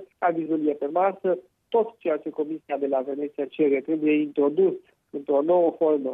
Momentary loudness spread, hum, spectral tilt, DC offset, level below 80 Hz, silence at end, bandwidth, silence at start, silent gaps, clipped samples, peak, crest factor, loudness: 9 LU; none; -9.5 dB/octave; under 0.1%; -80 dBFS; 0 s; 3.8 kHz; 0 s; none; under 0.1%; -12 dBFS; 14 dB; -25 LUFS